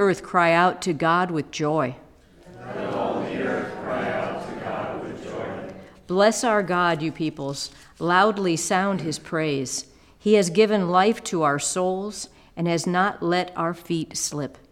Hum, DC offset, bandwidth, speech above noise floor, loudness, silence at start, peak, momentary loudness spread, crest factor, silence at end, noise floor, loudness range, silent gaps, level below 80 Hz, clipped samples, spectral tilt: none; under 0.1%; 16.5 kHz; 27 dB; -23 LUFS; 0 s; -6 dBFS; 13 LU; 18 dB; 0.2 s; -49 dBFS; 7 LU; none; -58 dBFS; under 0.1%; -4.5 dB/octave